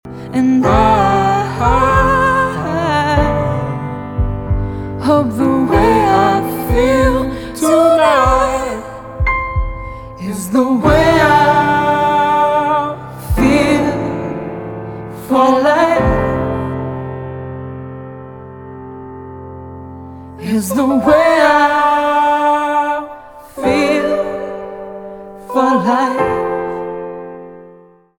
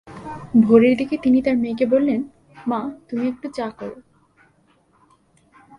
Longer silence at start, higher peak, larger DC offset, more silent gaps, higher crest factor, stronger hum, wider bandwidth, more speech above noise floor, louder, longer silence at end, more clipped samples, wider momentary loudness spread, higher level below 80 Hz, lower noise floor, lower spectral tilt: about the same, 0.05 s vs 0.05 s; about the same, 0 dBFS vs -2 dBFS; neither; neither; about the same, 14 dB vs 18 dB; neither; first, 20 kHz vs 10 kHz; second, 33 dB vs 41 dB; first, -14 LUFS vs -19 LUFS; second, 0.45 s vs 1.8 s; neither; about the same, 20 LU vs 21 LU; first, -28 dBFS vs -56 dBFS; second, -43 dBFS vs -59 dBFS; second, -6 dB/octave vs -8 dB/octave